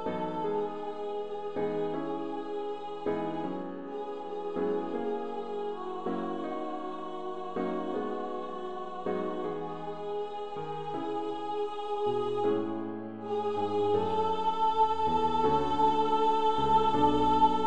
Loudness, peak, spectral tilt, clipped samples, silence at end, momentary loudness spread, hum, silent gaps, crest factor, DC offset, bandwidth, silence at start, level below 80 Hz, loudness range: -31 LUFS; -12 dBFS; -7 dB/octave; under 0.1%; 0 s; 12 LU; none; none; 18 dB; 0.6%; 9.4 kHz; 0 s; -58 dBFS; 8 LU